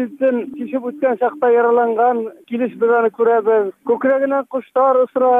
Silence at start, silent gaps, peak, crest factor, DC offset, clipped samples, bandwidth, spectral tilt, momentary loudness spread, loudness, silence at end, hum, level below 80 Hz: 0 s; none; -6 dBFS; 10 dB; under 0.1%; under 0.1%; 3.7 kHz; -8 dB/octave; 9 LU; -17 LUFS; 0 s; none; -74 dBFS